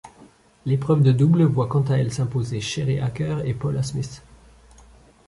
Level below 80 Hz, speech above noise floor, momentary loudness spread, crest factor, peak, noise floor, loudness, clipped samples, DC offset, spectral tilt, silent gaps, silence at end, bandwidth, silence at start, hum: -50 dBFS; 31 dB; 10 LU; 16 dB; -6 dBFS; -51 dBFS; -22 LUFS; under 0.1%; under 0.1%; -7 dB/octave; none; 1.1 s; 11.5 kHz; 0.05 s; none